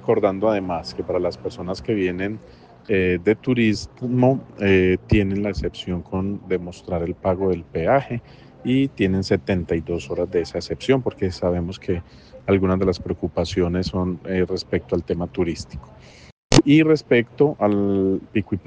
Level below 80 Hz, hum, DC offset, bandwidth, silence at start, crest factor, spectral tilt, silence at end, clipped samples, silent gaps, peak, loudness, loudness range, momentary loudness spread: -42 dBFS; none; under 0.1%; 9.6 kHz; 0 s; 20 dB; -6.5 dB/octave; 0.05 s; under 0.1%; 16.32-16.50 s; -2 dBFS; -22 LUFS; 4 LU; 10 LU